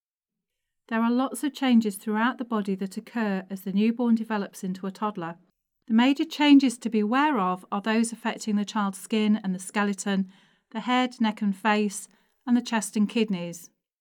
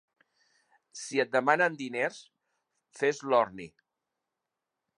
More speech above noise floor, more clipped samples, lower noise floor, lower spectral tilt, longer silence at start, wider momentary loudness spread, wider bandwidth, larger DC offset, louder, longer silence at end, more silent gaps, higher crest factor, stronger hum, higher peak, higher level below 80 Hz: first, 63 dB vs 58 dB; neither; about the same, -88 dBFS vs -87 dBFS; about the same, -5 dB/octave vs -4 dB/octave; about the same, 0.9 s vs 0.95 s; second, 10 LU vs 21 LU; first, 16 kHz vs 11.5 kHz; neither; first, -26 LUFS vs -29 LUFS; second, 0.35 s vs 1.35 s; neither; second, 18 dB vs 24 dB; neither; about the same, -8 dBFS vs -8 dBFS; about the same, -82 dBFS vs -78 dBFS